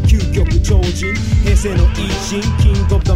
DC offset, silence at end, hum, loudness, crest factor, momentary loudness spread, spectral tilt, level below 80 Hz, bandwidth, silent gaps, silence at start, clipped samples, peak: 1%; 0 s; none; -15 LUFS; 12 dB; 5 LU; -6 dB/octave; -16 dBFS; 12.5 kHz; none; 0 s; under 0.1%; 0 dBFS